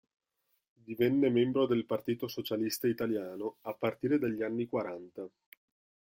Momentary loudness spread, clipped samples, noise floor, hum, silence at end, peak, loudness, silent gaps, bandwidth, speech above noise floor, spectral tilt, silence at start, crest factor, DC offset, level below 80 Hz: 14 LU; under 0.1%; -80 dBFS; none; 0.9 s; -16 dBFS; -32 LUFS; none; 16.5 kHz; 48 dB; -6 dB/octave; 0.9 s; 16 dB; under 0.1%; -72 dBFS